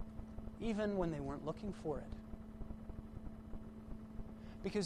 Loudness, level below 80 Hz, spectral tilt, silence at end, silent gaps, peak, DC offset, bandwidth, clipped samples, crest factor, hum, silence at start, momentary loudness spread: -45 LUFS; -52 dBFS; -7 dB/octave; 0 s; none; -26 dBFS; under 0.1%; 12 kHz; under 0.1%; 18 dB; none; 0 s; 14 LU